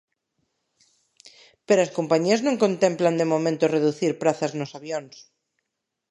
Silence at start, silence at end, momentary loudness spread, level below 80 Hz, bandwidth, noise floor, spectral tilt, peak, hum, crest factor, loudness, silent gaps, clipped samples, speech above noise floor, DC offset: 1.7 s; 0.9 s; 11 LU; -76 dBFS; 11.5 kHz; -82 dBFS; -5.5 dB/octave; -6 dBFS; none; 20 dB; -23 LUFS; none; under 0.1%; 60 dB; under 0.1%